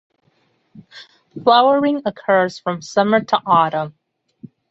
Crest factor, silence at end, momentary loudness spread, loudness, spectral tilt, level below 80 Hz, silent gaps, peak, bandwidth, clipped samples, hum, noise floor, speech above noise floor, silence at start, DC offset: 18 dB; 0.25 s; 13 LU; -17 LUFS; -5.5 dB/octave; -64 dBFS; none; -2 dBFS; 8 kHz; under 0.1%; none; -62 dBFS; 45 dB; 0.75 s; under 0.1%